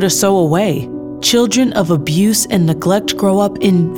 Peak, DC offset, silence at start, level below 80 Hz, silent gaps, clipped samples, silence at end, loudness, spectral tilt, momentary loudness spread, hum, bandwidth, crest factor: -2 dBFS; 0.2%; 0 s; -46 dBFS; none; under 0.1%; 0 s; -13 LUFS; -4.5 dB/octave; 4 LU; none; 19.5 kHz; 12 dB